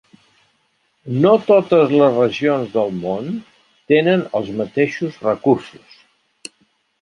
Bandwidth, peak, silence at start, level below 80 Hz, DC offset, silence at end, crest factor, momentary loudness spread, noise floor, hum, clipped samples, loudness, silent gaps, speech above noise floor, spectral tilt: 10.5 kHz; -2 dBFS; 1.05 s; -60 dBFS; under 0.1%; 1.35 s; 16 dB; 15 LU; -64 dBFS; none; under 0.1%; -17 LUFS; none; 48 dB; -7 dB/octave